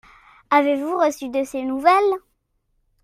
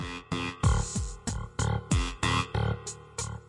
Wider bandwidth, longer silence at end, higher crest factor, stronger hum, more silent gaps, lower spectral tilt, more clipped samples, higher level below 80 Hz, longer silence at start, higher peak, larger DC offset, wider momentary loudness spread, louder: first, 15.5 kHz vs 11.5 kHz; first, 0.85 s vs 0.1 s; about the same, 20 dB vs 18 dB; neither; neither; second, -3 dB/octave vs -4.5 dB/octave; neither; second, -62 dBFS vs -36 dBFS; first, 0.5 s vs 0 s; first, -2 dBFS vs -12 dBFS; neither; about the same, 9 LU vs 9 LU; first, -20 LUFS vs -31 LUFS